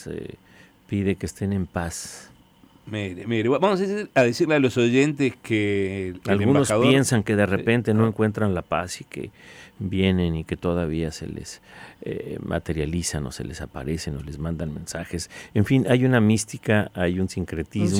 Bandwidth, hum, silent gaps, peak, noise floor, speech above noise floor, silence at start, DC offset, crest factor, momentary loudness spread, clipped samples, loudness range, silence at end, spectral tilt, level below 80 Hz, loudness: 16 kHz; none; none; -6 dBFS; -54 dBFS; 31 dB; 0 s; under 0.1%; 18 dB; 14 LU; under 0.1%; 9 LU; 0 s; -6 dB/octave; -46 dBFS; -23 LUFS